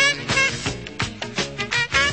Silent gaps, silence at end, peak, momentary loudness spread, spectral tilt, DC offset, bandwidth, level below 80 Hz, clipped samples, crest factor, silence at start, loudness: none; 0 s; -6 dBFS; 10 LU; -2.5 dB/octave; 0.2%; 8.8 kHz; -44 dBFS; under 0.1%; 16 dB; 0 s; -22 LUFS